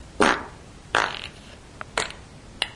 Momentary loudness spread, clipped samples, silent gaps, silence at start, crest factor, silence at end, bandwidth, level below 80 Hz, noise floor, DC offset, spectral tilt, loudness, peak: 23 LU; under 0.1%; none; 0 s; 28 dB; 0 s; 11.5 kHz; -48 dBFS; -44 dBFS; under 0.1%; -2.5 dB/octave; -25 LUFS; 0 dBFS